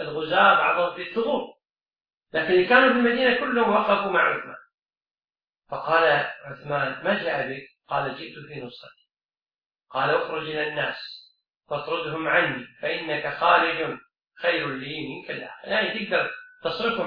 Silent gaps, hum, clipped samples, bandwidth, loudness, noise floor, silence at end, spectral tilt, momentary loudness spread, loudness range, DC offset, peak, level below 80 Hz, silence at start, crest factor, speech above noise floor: 1.70-1.75 s, 2.14-2.21 s, 4.74-4.78 s, 5.49-5.53 s, 9.25-9.29 s, 9.66-9.70 s; none; under 0.1%; 5.4 kHz; -23 LUFS; under -90 dBFS; 0 s; -7 dB/octave; 17 LU; 8 LU; under 0.1%; -4 dBFS; -64 dBFS; 0 s; 22 dB; over 66 dB